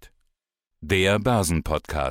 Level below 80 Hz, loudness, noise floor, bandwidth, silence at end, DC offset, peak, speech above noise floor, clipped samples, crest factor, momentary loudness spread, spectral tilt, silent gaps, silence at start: -38 dBFS; -23 LUFS; -80 dBFS; 16.5 kHz; 0 s; under 0.1%; -10 dBFS; 57 dB; under 0.1%; 14 dB; 6 LU; -5 dB/octave; none; 0.05 s